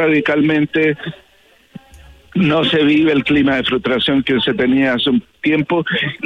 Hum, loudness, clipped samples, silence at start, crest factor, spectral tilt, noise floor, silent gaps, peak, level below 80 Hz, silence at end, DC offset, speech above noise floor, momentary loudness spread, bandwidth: none; -15 LUFS; under 0.1%; 0 s; 10 dB; -7 dB/octave; -51 dBFS; none; -4 dBFS; -48 dBFS; 0 s; under 0.1%; 36 dB; 5 LU; 7 kHz